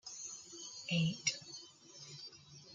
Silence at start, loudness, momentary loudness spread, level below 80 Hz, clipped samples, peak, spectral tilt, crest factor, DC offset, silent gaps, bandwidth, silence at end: 0.05 s; -40 LUFS; 18 LU; -82 dBFS; under 0.1%; -20 dBFS; -3.5 dB/octave; 22 dB; under 0.1%; none; 9.4 kHz; 0 s